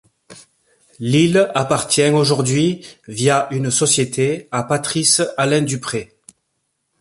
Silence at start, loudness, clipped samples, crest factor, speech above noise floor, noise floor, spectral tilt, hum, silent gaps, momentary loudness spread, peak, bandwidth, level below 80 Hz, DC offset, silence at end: 0.3 s; -17 LUFS; under 0.1%; 18 dB; 54 dB; -71 dBFS; -4 dB/octave; none; none; 9 LU; 0 dBFS; 11.5 kHz; -56 dBFS; under 0.1%; 0.95 s